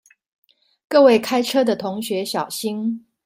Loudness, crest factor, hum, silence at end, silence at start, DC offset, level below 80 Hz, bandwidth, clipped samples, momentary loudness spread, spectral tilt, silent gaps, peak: -19 LUFS; 18 dB; none; 0.25 s; 0.9 s; under 0.1%; -68 dBFS; 16 kHz; under 0.1%; 11 LU; -4 dB/octave; none; -2 dBFS